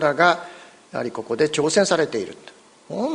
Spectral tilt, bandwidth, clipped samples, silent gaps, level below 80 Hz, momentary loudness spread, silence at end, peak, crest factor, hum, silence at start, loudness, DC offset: -3.5 dB/octave; 10.5 kHz; under 0.1%; none; -64 dBFS; 15 LU; 0 s; -2 dBFS; 20 dB; none; 0 s; -21 LUFS; under 0.1%